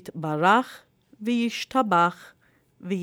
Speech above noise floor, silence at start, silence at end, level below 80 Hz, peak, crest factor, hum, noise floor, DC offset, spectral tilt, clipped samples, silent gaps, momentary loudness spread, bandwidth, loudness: 31 dB; 0.05 s; 0 s; -70 dBFS; -6 dBFS; 20 dB; none; -55 dBFS; under 0.1%; -5.5 dB/octave; under 0.1%; none; 14 LU; 18 kHz; -24 LUFS